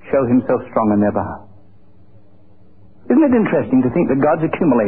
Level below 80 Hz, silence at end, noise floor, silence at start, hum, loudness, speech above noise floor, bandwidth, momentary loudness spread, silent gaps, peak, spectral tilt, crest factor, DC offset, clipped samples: -46 dBFS; 0 s; -50 dBFS; 0.05 s; none; -16 LUFS; 35 dB; 3.2 kHz; 5 LU; none; -2 dBFS; -13.5 dB/octave; 14 dB; 0.9%; under 0.1%